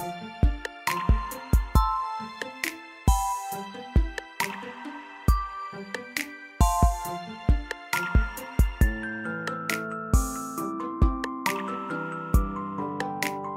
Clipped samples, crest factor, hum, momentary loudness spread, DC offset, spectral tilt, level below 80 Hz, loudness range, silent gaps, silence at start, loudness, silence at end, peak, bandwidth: under 0.1%; 20 dB; none; 10 LU; under 0.1%; -5 dB/octave; -30 dBFS; 3 LU; none; 0 s; -29 LUFS; 0 s; -8 dBFS; 16 kHz